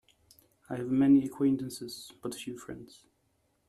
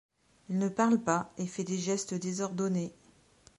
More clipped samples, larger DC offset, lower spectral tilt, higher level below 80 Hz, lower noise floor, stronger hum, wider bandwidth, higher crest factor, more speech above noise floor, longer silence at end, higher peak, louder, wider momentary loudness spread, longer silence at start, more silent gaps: neither; neither; about the same, -6 dB/octave vs -5.5 dB/octave; about the same, -68 dBFS vs -72 dBFS; first, -74 dBFS vs -62 dBFS; neither; first, 13.5 kHz vs 11.5 kHz; about the same, 18 dB vs 20 dB; first, 44 dB vs 31 dB; first, 0.85 s vs 0.65 s; about the same, -14 dBFS vs -12 dBFS; about the same, -30 LUFS vs -32 LUFS; first, 19 LU vs 9 LU; first, 0.7 s vs 0.5 s; neither